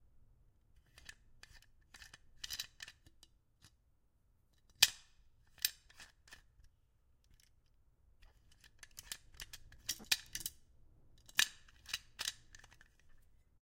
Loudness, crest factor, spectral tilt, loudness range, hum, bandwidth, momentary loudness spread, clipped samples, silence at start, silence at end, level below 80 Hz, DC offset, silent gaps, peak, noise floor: -38 LUFS; 40 dB; 2 dB/octave; 13 LU; none; 16.5 kHz; 28 LU; under 0.1%; 1.55 s; 1.05 s; -66 dBFS; under 0.1%; none; -6 dBFS; -74 dBFS